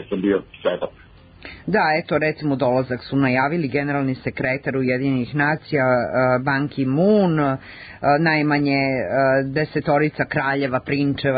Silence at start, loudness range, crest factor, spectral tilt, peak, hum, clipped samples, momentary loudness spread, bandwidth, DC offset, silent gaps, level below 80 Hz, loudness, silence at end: 0 s; 2 LU; 14 dB; -12 dB/octave; -6 dBFS; none; under 0.1%; 7 LU; 5 kHz; under 0.1%; none; -50 dBFS; -20 LUFS; 0 s